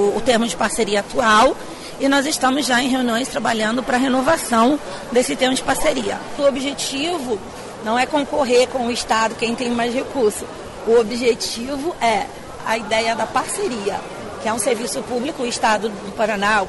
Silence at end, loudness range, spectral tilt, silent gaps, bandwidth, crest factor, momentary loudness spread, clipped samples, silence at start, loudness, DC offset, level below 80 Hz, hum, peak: 0 s; 4 LU; -3 dB/octave; none; 12 kHz; 14 dB; 9 LU; under 0.1%; 0 s; -19 LUFS; under 0.1%; -46 dBFS; none; -6 dBFS